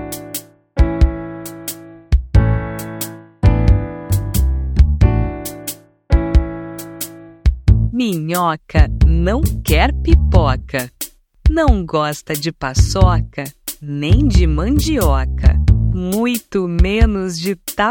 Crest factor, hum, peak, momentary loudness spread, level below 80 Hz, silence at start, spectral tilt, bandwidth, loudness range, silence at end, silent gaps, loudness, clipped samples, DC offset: 14 dB; none; 0 dBFS; 14 LU; -18 dBFS; 0 s; -6 dB/octave; 19.5 kHz; 3 LU; 0 s; none; -17 LUFS; under 0.1%; under 0.1%